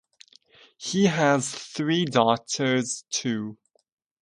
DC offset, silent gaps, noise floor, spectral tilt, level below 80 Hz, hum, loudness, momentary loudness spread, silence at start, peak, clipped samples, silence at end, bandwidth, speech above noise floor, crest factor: under 0.1%; none; -56 dBFS; -4 dB/octave; -68 dBFS; none; -24 LUFS; 10 LU; 0.8 s; -4 dBFS; under 0.1%; 0.7 s; 11.5 kHz; 32 dB; 22 dB